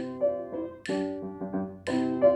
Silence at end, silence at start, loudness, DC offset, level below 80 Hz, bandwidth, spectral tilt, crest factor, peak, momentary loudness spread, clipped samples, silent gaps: 0 s; 0 s; -31 LUFS; under 0.1%; -66 dBFS; 10 kHz; -6.5 dB/octave; 18 dB; -10 dBFS; 7 LU; under 0.1%; none